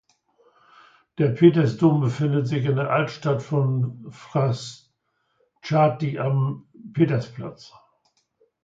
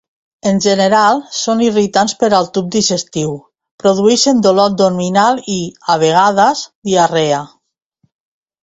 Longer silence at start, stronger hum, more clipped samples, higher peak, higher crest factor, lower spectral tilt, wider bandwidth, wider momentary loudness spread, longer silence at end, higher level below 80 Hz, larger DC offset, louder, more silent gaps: first, 1.2 s vs 0.45 s; neither; neither; second, -4 dBFS vs 0 dBFS; first, 20 dB vs 14 dB; first, -8 dB/octave vs -4 dB/octave; about the same, 7.8 kHz vs 8.4 kHz; first, 20 LU vs 9 LU; second, 0.95 s vs 1.2 s; second, -64 dBFS vs -54 dBFS; neither; second, -22 LUFS vs -13 LUFS; second, none vs 3.71-3.78 s, 6.75-6.82 s